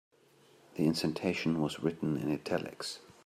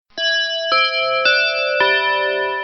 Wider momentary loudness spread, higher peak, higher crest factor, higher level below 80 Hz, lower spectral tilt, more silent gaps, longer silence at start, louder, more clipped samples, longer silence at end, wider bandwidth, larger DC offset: first, 10 LU vs 4 LU; second, -16 dBFS vs -4 dBFS; about the same, 18 dB vs 14 dB; second, -68 dBFS vs -62 dBFS; first, -5.5 dB/octave vs 3.5 dB/octave; neither; first, 0.75 s vs 0.15 s; second, -34 LUFS vs -16 LUFS; neither; first, 0.25 s vs 0 s; first, 15 kHz vs 6.4 kHz; neither